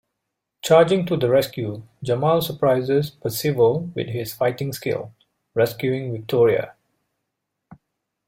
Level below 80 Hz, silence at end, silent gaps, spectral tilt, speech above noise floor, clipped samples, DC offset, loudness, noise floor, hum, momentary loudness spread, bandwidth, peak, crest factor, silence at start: -58 dBFS; 0.55 s; none; -6 dB/octave; 60 dB; under 0.1%; under 0.1%; -21 LUFS; -80 dBFS; none; 12 LU; 16.5 kHz; -2 dBFS; 20 dB; 0.65 s